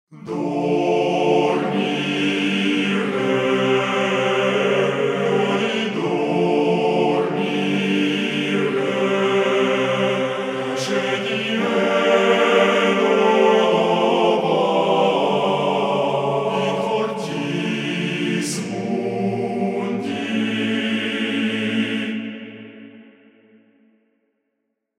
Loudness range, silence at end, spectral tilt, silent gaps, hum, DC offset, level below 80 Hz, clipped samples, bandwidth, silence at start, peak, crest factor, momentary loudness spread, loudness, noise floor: 6 LU; 1.95 s; -5 dB/octave; none; none; under 0.1%; -74 dBFS; under 0.1%; 13.5 kHz; 0.1 s; -4 dBFS; 16 dB; 7 LU; -19 LUFS; -75 dBFS